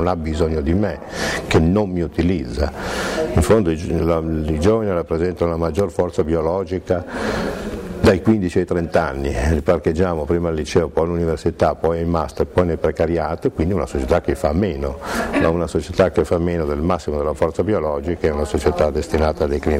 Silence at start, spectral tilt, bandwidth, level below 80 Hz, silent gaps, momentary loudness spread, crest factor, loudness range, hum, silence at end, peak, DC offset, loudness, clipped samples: 0 s; -7 dB/octave; 15.5 kHz; -30 dBFS; none; 6 LU; 14 dB; 1 LU; none; 0 s; -4 dBFS; under 0.1%; -19 LUFS; under 0.1%